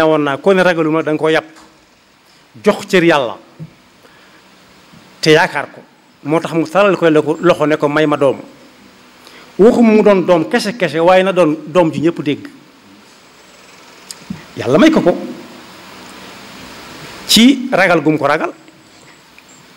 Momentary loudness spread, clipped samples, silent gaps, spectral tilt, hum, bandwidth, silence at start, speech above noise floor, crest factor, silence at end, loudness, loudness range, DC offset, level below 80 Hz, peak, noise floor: 23 LU; under 0.1%; none; -5 dB/octave; none; 16.5 kHz; 0 s; 37 dB; 14 dB; 1.25 s; -12 LUFS; 6 LU; under 0.1%; -52 dBFS; 0 dBFS; -49 dBFS